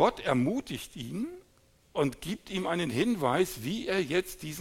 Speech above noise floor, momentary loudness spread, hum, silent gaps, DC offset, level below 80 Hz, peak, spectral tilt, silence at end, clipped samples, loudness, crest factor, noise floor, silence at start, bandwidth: 34 dB; 11 LU; none; none; under 0.1%; -56 dBFS; -10 dBFS; -5 dB/octave; 0 s; under 0.1%; -31 LUFS; 20 dB; -64 dBFS; 0 s; 17 kHz